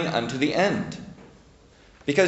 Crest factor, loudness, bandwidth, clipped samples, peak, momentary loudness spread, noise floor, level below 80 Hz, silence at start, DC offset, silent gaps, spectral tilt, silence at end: 22 dB; -25 LUFS; 8.2 kHz; under 0.1%; -4 dBFS; 17 LU; -53 dBFS; -56 dBFS; 0 s; under 0.1%; none; -5 dB/octave; 0 s